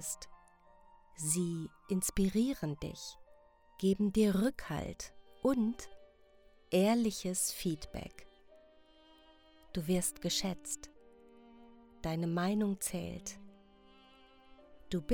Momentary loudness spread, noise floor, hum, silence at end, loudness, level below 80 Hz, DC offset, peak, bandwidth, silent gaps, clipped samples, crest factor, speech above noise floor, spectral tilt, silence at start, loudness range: 16 LU; -63 dBFS; none; 0 s; -35 LUFS; -56 dBFS; under 0.1%; -18 dBFS; over 20 kHz; none; under 0.1%; 20 dB; 29 dB; -4.5 dB/octave; 0 s; 5 LU